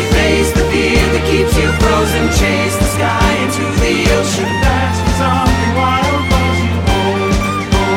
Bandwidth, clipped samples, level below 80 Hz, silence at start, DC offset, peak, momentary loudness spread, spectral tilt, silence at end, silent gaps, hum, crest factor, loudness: 17 kHz; under 0.1%; -20 dBFS; 0 s; under 0.1%; 0 dBFS; 3 LU; -5 dB/octave; 0 s; none; none; 12 dB; -13 LUFS